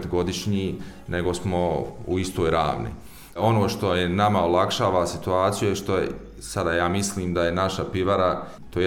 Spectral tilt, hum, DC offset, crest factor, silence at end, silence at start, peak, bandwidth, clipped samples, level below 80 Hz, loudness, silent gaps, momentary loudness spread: -5.5 dB/octave; none; under 0.1%; 16 dB; 0 s; 0 s; -8 dBFS; 17.5 kHz; under 0.1%; -44 dBFS; -24 LUFS; none; 10 LU